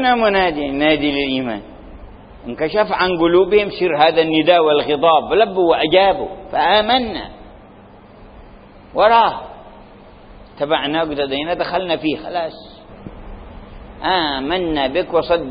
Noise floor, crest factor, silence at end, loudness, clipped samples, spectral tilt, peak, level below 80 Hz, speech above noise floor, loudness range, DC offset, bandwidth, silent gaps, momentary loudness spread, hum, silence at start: -42 dBFS; 16 dB; 0 s; -16 LUFS; under 0.1%; -10 dB/octave; 0 dBFS; -42 dBFS; 26 dB; 8 LU; under 0.1%; 5.2 kHz; none; 17 LU; none; 0 s